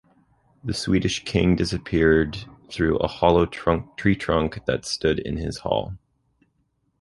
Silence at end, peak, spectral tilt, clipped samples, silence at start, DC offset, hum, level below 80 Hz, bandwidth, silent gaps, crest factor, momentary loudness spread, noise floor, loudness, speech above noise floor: 1.05 s; -2 dBFS; -6 dB/octave; under 0.1%; 0.65 s; under 0.1%; none; -38 dBFS; 11.5 kHz; none; 22 dB; 10 LU; -70 dBFS; -23 LUFS; 48 dB